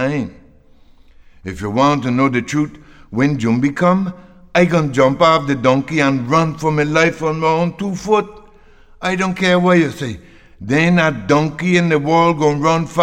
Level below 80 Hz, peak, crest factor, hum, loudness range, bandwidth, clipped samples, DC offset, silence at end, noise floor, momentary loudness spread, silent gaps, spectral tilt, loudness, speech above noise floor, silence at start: -46 dBFS; -2 dBFS; 14 dB; none; 3 LU; 10 kHz; under 0.1%; under 0.1%; 0 s; -46 dBFS; 12 LU; none; -6 dB/octave; -16 LUFS; 31 dB; 0 s